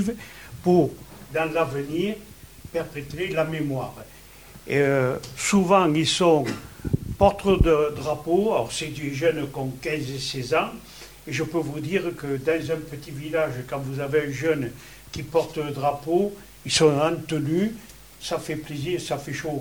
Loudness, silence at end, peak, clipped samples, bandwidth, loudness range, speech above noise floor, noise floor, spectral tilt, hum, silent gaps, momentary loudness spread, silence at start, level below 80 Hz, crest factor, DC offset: -24 LUFS; 0 s; -4 dBFS; under 0.1%; over 20 kHz; 6 LU; 22 dB; -46 dBFS; -5 dB/octave; none; none; 16 LU; 0 s; -40 dBFS; 20 dB; 0.1%